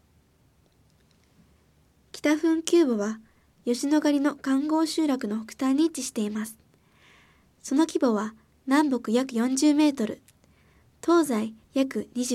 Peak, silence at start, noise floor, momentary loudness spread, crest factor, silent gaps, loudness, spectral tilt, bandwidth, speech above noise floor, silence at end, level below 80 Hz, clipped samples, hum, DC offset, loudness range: -6 dBFS; 2.15 s; -63 dBFS; 11 LU; 20 dB; none; -25 LUFS; -4 dB/octave; 15 kHz; 39 dB; 0 s; -68 dBFS; under 0.1%; none; under 0.1%; 3 LU